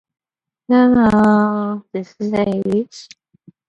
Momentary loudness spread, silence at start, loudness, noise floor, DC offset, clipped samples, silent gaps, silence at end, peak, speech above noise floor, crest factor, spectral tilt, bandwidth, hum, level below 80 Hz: 13 LU; 0.7 s; -16 LUFS; -50 dBFS; under 0.1%; under 0.1%; none; 0.65 s; -2 dBFS; 35 dB; 14 dB; -7.5 dB/octave; 8.2 kHz; none; -48 dBFS